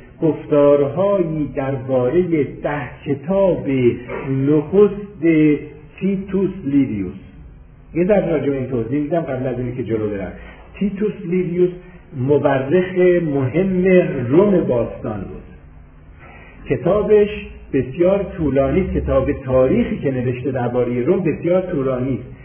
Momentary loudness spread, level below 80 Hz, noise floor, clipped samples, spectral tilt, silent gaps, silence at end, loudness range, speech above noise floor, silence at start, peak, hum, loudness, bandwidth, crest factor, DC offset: 11 LU; -38 dBFS; -42 dBFS; under 0.1%; -12.5 dB/octave; none; 0 s; 4 LU; 24 dB; 0 s; -2 dBFS; none; -18 LUFS; 3.5 kHz; 16 dB; under 0.1%